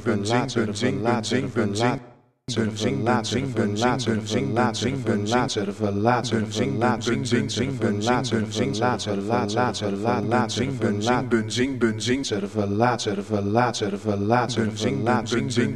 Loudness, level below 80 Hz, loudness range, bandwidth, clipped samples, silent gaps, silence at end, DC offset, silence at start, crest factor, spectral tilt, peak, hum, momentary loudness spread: -24 LUFS; -52 dBFS; 1 LU; 12.5 kHz; under 0.1%; none; 0 s; 0.3%; 0 s; 20 dB; -5.5 dB/octave; -4 dBFS; none; 4 LU